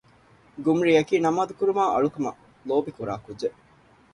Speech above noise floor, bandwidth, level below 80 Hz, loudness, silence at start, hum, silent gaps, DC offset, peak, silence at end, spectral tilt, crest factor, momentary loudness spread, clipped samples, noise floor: 33 dB; 11 kHz; -62 dBFS; -24 LUFS; 0.55 s; none; none; under 0.1%; -8 dBFS; 0.65 s; -6 dB/octave; 18 dB; 12 LU; under 0.1%; -57 dBFS